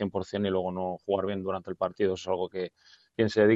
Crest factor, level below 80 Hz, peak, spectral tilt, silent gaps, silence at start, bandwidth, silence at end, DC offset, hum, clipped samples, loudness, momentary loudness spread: 18 dB; -68 dBFS; -10 dBFS; -6.5 dB/octave; none; 0 s; 7.8 kHz; 0 s; under 0.1%; none; under 0.1%; -30 LUFS; 6 LU